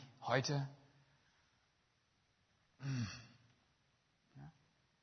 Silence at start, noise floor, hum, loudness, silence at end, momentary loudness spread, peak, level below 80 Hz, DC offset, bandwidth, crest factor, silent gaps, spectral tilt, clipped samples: 0 s; -79 dBFS; none; -41 LUFS; 0.5 s; 23 LU; -20 dBFS; -80 dBFS; under 0.1%; 6.4 kHz; 26 dB; none; -4.5 dB/octave; under 0.1%